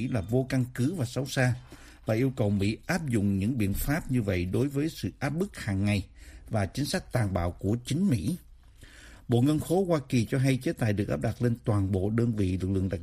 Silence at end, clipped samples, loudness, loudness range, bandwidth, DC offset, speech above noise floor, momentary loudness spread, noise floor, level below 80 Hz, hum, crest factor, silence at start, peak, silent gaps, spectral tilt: 0 s; under 0.1%; -29 LUFS; 3 LU; 15.5 kHz; under 0.1%; 24 dB; 5 LU; -51 dBFS; -46 dBFS; none; 18 dB; 0 s; -10 dBFS; none; -6.5 dB/octave